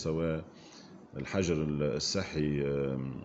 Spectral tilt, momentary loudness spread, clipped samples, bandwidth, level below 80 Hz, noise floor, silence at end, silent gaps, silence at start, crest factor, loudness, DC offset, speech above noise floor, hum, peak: -5.5 dB/octave; 20 LU; under 0.1%; 8.2 kHz; -52 dBFS; -52 dBFS; 0 s; none; 0 s; 16 dB; -33 LUFS; under 0.1%; 20 dB; none; -16 dBFS